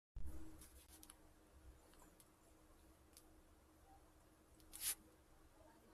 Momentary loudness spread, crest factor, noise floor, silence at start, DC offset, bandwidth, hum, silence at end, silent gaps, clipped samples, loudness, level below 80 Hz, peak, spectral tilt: 24 LU; 26 dB; -70 dBFS; 0.15 s; under 0.1%; 15 kHz; none; 0 s; none; under 0.1%; -51 LUFS; -64 dBFS; -30 dBFS; -2 dB/octave